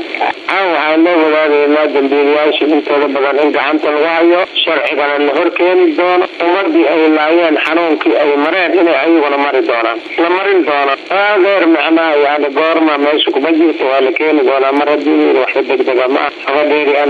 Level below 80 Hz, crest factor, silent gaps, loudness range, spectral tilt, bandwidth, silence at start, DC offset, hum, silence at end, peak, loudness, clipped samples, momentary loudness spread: -66 dBFS; 8 dB; none; 1 LU; -5 dB/octave; 6.2 kHz; 0 s; under 0.1%; none; 0 s; -2 dBFS; -11 LUFS; under 0.1%; 3 LU